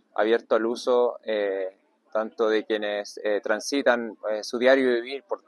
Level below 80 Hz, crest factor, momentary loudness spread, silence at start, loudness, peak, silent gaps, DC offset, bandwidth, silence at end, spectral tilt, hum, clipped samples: -82 dBFS; 18 dB; 9 LU; 0.15 s; -25 LUFS; -6 dBFS; none; under 0.1%; 12 kHz; 0.1 s; -3 dB/octave; none; under 0.1%